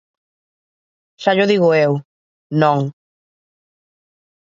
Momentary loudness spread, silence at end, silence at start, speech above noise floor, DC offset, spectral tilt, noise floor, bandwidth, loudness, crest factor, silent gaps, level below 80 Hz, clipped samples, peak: 10 LU; 1.6 s; 1.2 s; over 75 dB; under 0.1%; -7 dB/octave; under -90 dBFS; 7.6 kHz; -16 LUFS; 20 dB; 2.05-2.50 s; -68 dBFS; under 0.1%; 0 dBFS